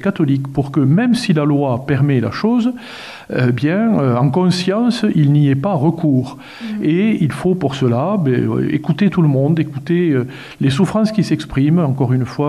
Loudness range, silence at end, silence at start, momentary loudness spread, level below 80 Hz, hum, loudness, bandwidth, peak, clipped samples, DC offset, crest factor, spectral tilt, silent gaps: 1 LU; 0 s; 0 s; 5 LU; -48 dBFS; none; -16 LUFS; 12 kHz; -2 dBFS; under 0.1%; 0.1%; 12 dB; -7.5 dB/octave; none